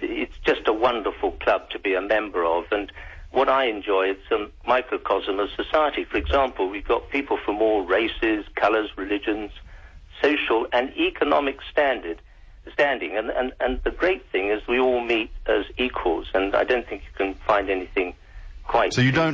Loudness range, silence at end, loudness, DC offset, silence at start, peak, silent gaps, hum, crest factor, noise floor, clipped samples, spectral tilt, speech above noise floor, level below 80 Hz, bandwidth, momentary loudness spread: 1 LU; 0 s; -23 LUFS; under 0.1%; 0 s; -8 dBFS; none; none; 16 dB; -43 dBFS; under 0.1%; -6 dB/octave; 20 dB; -42 dBFS; 7.8 kHz; 7 LU